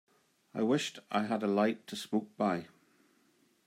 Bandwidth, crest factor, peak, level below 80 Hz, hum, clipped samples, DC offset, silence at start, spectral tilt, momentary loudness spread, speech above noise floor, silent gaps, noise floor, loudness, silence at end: 15 kHz; 18 dB; -16 dBFS; -84 dBFS; none; under 0.1%; under 0.1%; 0.55 s; -5.5 dB/octave; 8 LU; 37 dB; none; -70 dBFS; -33 LUFS; 1 s